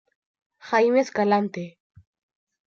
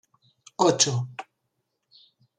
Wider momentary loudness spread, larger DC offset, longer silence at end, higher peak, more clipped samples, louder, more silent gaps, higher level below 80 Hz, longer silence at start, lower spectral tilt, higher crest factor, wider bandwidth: second, 15 LU vs 22 LU; neither; second, 1 s vs 1.15 s; about the same, -6 dBFS vs -6 dBFS; neither; about the same, -22 LUFS vs -22 LUFS; neither; about the same, -74 dBFS vs -70 dBFS; about the same, 0.65 s vs 0.6 s; first, -6 dB/octave vs -3.5 dB/octave; second, 18 dB vs 24 dB; second, 7.4 kHz vs 11 kHz